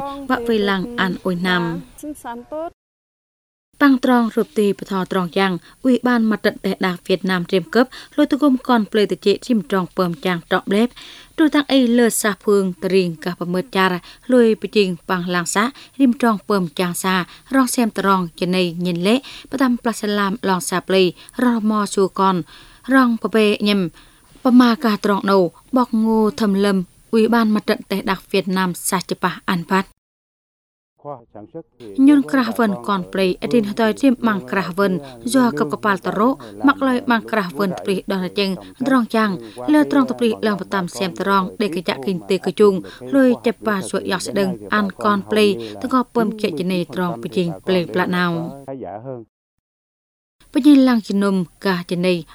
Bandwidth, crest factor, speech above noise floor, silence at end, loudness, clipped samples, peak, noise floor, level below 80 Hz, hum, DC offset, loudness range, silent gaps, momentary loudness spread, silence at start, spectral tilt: over 20 kHz; 18 dB; over 72 dB; 0.1 s; -18 LUFS; under 0.1%; 0 dBFS; under -90 dBFS; -54 dBFS; none; under 0.1%; 4 LU; 2.73-3.72 s, 29.98-30.96 s, 49.29-50.39 s; 8 LU; 0 s; -5.5 dB/octave